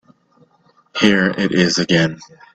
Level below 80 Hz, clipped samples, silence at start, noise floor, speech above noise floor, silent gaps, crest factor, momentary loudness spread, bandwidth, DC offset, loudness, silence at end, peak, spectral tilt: -52 dBFS; under 0.1%; 0.95 s; -56 dBFS; 40 dB; none; 18 dB; 11 LU; 8.8 kHz; under 0.1%; -16 LUFS; 0.3 s; 0 dBFS; -4.5 dB/octave